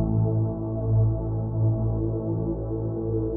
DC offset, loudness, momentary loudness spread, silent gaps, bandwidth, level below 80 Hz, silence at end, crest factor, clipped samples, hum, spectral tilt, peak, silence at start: under 0.1%; -26 LUFS; 6 LU; none; 1.6 kHz; -36 dBFS; 0 s; 12 dB; under 0.1%; none; -14 dB/octave; -12 dBFS; 0 s